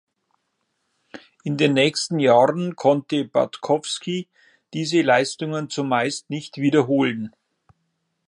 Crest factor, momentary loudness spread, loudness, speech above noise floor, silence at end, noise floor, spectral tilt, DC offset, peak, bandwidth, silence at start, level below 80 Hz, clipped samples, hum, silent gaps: 20 dB; 12 LU; -21 LUFS; 53 dB; 1 s; -74 dBFS; -5 dB/octave; under 0.1%; -2 dBFS; 11 kHz; 1.15 s; -70 dBFS; under 0.1%; none; none